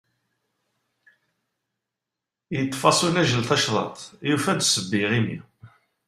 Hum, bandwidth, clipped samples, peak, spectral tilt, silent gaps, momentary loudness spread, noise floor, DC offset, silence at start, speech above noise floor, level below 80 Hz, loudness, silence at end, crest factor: none; 15 kHz; under 0.1%; -2 dBFS; -3.5 dB/octave; none; 11 LU; -86 dBFS; under 0.1%; 2.5 s; 64 dB; -62 dBFS; -22 LUFS; 0.4 s; 24 dB